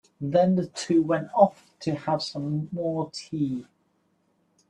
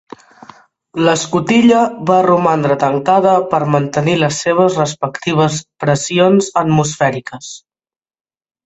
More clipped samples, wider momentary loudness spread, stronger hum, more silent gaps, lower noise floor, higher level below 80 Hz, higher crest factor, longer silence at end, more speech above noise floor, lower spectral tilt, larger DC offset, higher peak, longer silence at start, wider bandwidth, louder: neither; about the same, 10 LU vs 8 LU; neither; neither; second, -69 dBFS vs under -90 dBFS; second, -68 dBFS vs -52 dBFS; first, 22 dB vs 14 dB; about the same, 1.05 s vs 1.1 s; second, 44 dB vs over 77 dB; about the same, -6.5 dB/octave vs -5.5 dB/octave; neither; second, -4 dBFS vs 0 dBFS; second, 0.2 s vs 0.95 s; first, 10.5 kHz vs 8.2 kHz; second, -26 LUFS vs -13 LUFS